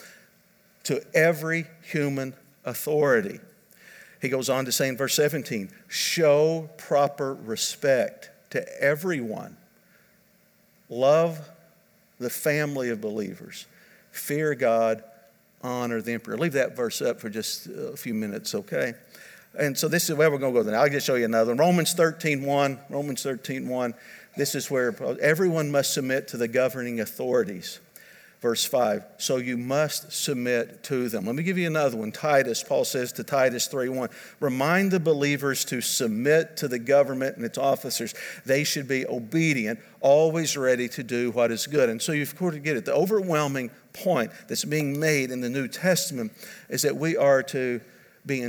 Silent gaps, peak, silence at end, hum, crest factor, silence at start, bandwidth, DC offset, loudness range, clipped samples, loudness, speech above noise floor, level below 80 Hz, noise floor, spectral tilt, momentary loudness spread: none; -8 dBFS; 0 s; none; 18 dB; 0 s; over 20 kHz; under 0.1%; 5 LU; under 0.1%; -25 LUFS; 36 dB; -78 dBFS; -61 dBFS; -4 dB/octave; 11 LU